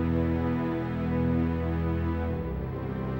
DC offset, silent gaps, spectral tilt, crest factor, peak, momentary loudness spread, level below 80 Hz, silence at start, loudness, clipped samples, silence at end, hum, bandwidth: under 0.1%; none; -10 dB/octave; 12 dB; -16 dBFS; 6 LU; -38 dBFS; 0 s; -29 LUFS; under 0.1%; 0 s; none; 16 kHz